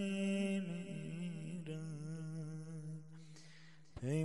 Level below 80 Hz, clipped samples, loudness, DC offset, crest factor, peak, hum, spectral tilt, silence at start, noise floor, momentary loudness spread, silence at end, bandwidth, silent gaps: -72 dBFS; under 0.1%; -44 LUFS; 0.1%; 14 dB; -28 dBFS; none; -6.5 dB/octave; 0 s; -62 dBFS; 20 LU; 0 s; 11.5 kHz; none